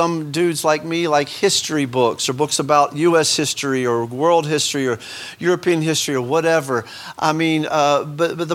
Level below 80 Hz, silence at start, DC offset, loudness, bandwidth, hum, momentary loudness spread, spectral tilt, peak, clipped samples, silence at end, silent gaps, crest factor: -64 dBFS; 0 s; under 0.1%; -18 LUFS; 16.5 kHz; none; 6 LU; -4 dB/octave; -2 dBFS; under 0.1%; 0 s; none; 18 dB